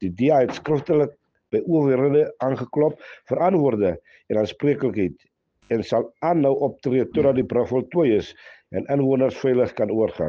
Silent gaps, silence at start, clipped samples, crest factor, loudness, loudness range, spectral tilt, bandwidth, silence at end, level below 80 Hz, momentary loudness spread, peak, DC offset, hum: none; 0 s; under 0.1%; 14 dB; -22 LUFS; 2 LU; -8.5 dB/octave; 7 kHz; 0 s; -56 dBFS; 8 LU; -6 dBFS; under 0.1%; none